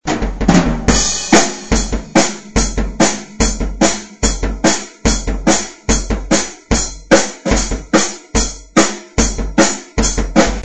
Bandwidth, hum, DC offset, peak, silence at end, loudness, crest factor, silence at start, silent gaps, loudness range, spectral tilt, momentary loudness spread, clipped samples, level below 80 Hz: 9 kHz; none; 2%; 0 dBFS; 0 s; -15 LUFS; 16 dB; 0 s; none; 2 LU; -3.5 dB/octave; 5 LU; 0.2%; -22 dBFS